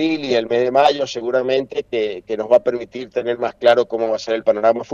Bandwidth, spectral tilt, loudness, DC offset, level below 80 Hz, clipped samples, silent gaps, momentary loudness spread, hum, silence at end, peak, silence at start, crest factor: 7.4 kHz; -4.5 dB/octave; -18 LUFS; under 0.1%; -60 dBFS; under 0.1%; none; 8 LU; none; 0 s; -2 dBFS; 0 s; 16 dB